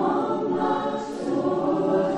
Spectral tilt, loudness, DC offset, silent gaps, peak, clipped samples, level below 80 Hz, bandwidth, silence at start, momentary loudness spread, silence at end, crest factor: -7 dB/octave; -25 LUFS; under 0.1%; none; -12 dBFS; under 0.1%; -58 dBFS; 9.6 kHz; 0 s; 5 LU; 0 s; 12 dB